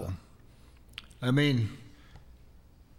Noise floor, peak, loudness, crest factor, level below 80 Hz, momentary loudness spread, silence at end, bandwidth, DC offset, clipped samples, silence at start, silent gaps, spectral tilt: -55 dBFS; -14 dBFS; -29 LUFS; 18 dB; -56 dBFS; 21 LU; 0.8 s; 14 kHz; under 0.1%; under 0.1%; 0 s; none; -6.5 dB/octave